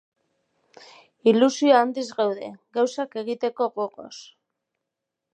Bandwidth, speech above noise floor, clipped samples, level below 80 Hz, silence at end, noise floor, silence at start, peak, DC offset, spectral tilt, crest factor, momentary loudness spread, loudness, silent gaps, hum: 9.2 kHz; 61 dB; under 0.1%; -82 dBFS; 1.1 s; -84 dBFS; 1.25 s; -4 dBFS; under 0.1%; -4.5 dB/octave; 20 dB; 15 LU; -23 LUFS; none; none